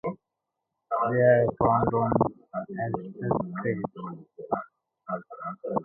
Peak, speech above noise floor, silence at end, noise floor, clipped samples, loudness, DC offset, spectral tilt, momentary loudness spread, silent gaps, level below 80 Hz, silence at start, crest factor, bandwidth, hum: -6 dBFS; 59 dB; 0 s; -84 dBFS; under 0.1%; -27 LUFS; under 0.1%; -12.5 dB/octave; 19 LU; none; -54 dBFS; 0.05 s; 20 dB; 3.2 kHz; none